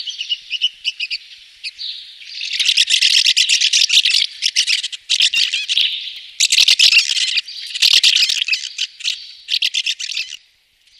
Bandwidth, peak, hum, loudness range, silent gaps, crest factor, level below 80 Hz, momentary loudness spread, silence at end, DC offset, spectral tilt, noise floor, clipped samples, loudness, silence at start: 15.5 kHz; 0 dBFS; none; 3 LU; none; 16 dB; -70 dBFS; 17 LU; 0.65 s; under 0.1%; 6.5 dB/octave; -55 dBFS; under 0.1%; -13 LUFS; 0 s